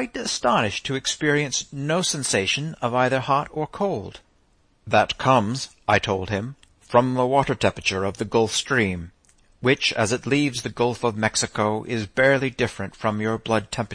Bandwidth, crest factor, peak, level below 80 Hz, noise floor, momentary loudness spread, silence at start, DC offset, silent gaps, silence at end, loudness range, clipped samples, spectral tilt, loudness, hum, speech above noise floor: 10.5 kHz; 18 dB; -4 dBFS; -52 dBFS; -61 dBFS; 7 LU; 0 s; under 0.1%; none; 0 s; 2 LU; under 0.1%; -4 dB/octave; -22 LUFS; none; 39 dB